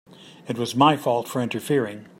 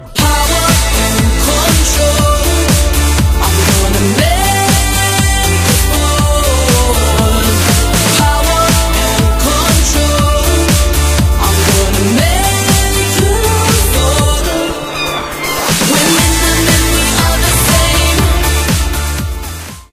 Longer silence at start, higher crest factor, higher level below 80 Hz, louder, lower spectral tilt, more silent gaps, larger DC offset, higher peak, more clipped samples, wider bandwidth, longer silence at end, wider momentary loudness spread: about the same, 0.1 s vs 0 s; first, 20 dB vs 10 dB; second, -68 dBFS vs -14 dBFS; second, -23 LUFS vs -10 LUFS; first, -5.5 dB/octave vs -3.5 dB/octave; neither; neither; second, -4 dBFS vs 0 dBFS; neither; about the same, 16.5 kHz vs 16 kHz; about the same, 0.15 s vs 0.1 s; first, 12 LU vs 4 LU